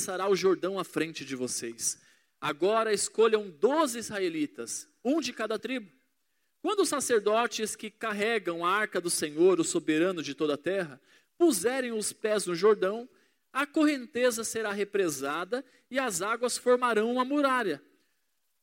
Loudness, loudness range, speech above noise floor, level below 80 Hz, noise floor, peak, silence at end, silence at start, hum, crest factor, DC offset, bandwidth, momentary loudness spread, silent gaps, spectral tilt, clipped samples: -29 LUFS; 3 LU; 50 dB; -78 dBFS; -79 dBFS; -12 dBFS; 0.85 s; 0 s; none; 18 dB; under 0.1%; 16.5 kHz; 10 LU; none; -3 dB/octave; under 0.1%